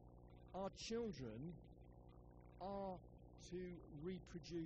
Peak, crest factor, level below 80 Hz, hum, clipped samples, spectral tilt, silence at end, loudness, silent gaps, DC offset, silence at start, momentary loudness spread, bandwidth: -36 dBFS; 16 dB; -66 dBFS; 60 Hz at -65 dBFS; under 0.1%; -5.5 dB/octave; 0 s; -52 LUFS; none; under 0.1%; 0 s; 17 LU; 7.6 kHz